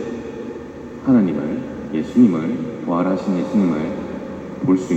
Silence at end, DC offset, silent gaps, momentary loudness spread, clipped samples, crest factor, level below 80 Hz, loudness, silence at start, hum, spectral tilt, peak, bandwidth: 0 s; under 0.1%; none; 15 LU; under 0.1%; 16 dB; -50 dBFS; -20 LUFS; 0 s; none; -8 dB/octave; -2 dBFS; 8.2 kHz